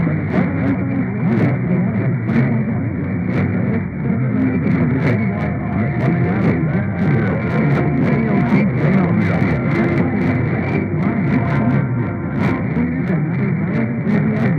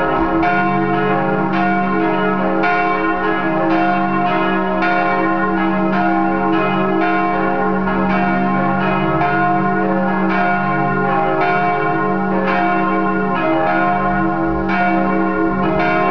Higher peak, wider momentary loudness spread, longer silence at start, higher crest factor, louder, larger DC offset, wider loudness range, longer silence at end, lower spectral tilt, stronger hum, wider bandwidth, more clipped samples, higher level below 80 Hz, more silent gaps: about the same, -2 dBFS vs -4 dBFS; about the same, 4 LU vs 2 LU; about the same, 0 s vs 0 s; about the same, 14 dB vs 12 dB; about the same, -17 LUFS vs -16 LUFS; second, under 0.1% vs 4%; about the same, 2 LU vs 0 LU; about the same, 0 s vs 0 s; first, -10.5 dB/octave vs -9 dB/octave; neither; first, 6 kHz vs 5.4 kHz; neither; about the same, -42 dBFS vs -40 dBFS; neither